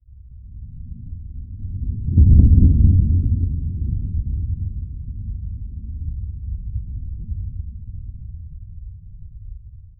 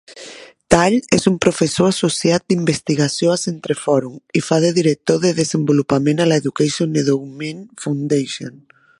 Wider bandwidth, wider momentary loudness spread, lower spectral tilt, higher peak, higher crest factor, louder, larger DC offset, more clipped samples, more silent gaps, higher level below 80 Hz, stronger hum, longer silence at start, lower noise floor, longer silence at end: second, 0.7 kHz vs 11.5 kHz; first, 26 LU vs 13 LU; first, -19 dB/octave vs -5 dB/octave; about the same, -2 dBFS vs 0 dBFS; about the same, 18 dB vs 18 dB; second, -20 LUFS vs -17 LUFS; neither; neither; neither; first, -22 dBFS vs -48 dBFS; neither; about the same, 0.1 s vs 0.1 s; about the same, -40 dBFS vs -38 dBFS; second, 0.1 s vs 0.5 s